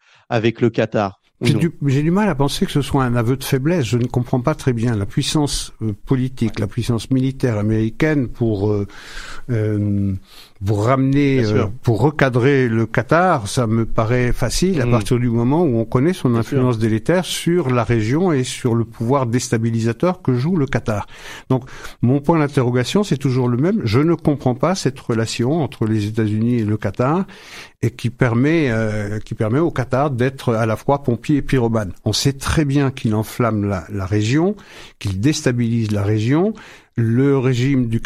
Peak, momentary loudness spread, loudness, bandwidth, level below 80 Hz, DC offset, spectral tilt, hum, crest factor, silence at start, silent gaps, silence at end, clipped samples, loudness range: -2 dBFS; 6 LU; -18 LUFS; 15 kHz; -36 dBFS; under 0.1%; -6.5 dB/octave; none; 16 dB; 0.3 s; none; 0 s; under 0.1%; 3 LU